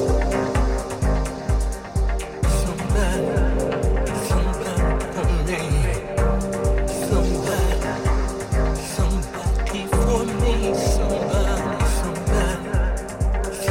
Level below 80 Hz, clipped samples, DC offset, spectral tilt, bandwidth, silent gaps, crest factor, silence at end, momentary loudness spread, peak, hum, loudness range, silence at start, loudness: -22 dBFS; under 0.1%; under 0.1%; -5.5 dB/octave; 16 kHz; none; 14 dB; 0 s; 4 LU; -6 dBFS; none; 1 LU; 0 s; -23 LUFS